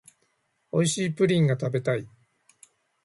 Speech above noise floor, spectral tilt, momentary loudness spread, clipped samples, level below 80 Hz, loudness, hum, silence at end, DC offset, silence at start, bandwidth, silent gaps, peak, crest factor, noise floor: 48 dB; -5.5 dB/octave; 8 LU; under 0.1%; -66 dBFS; -25 LUFS; none; 0.95 s; under 0.1%; 0.75 s; 11.5 kHz; none; -10 dBFS; 16 dB; -72 dBFS